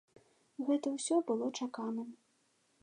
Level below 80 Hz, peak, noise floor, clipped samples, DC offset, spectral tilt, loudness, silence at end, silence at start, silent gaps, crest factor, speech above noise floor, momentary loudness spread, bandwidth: under -90 dBFS; -20 dBFS; -75 dBFS; under 0.1%; under 0.1%; -4 dB/octave; -36 LUFS; 0.7 s; 0.6 s; none; 18 dB; 40 dB; 12 LU; 11 kHz